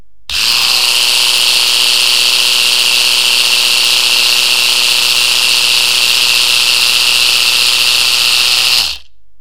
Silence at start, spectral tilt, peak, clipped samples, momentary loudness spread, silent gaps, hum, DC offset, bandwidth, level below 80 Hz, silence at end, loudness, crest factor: 0.3 s; 2.5 dB/octave; 0 dBFS; 0.3%; 1 LU; none; none; 4%; over 20 kHz; -48 dBFS; 0.4 s; -7 LUFS; 10 dB